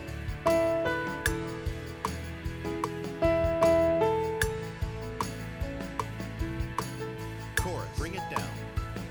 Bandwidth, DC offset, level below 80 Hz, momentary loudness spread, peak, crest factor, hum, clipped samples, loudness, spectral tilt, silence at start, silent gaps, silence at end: over 20 kHz; under 0.1%; -42 dBFS; 12 LU; -10 dBFS; 20 dB; none; under 0.1%; -31 LUFS; -5.5 dB/octave; 0 s; none; 0 s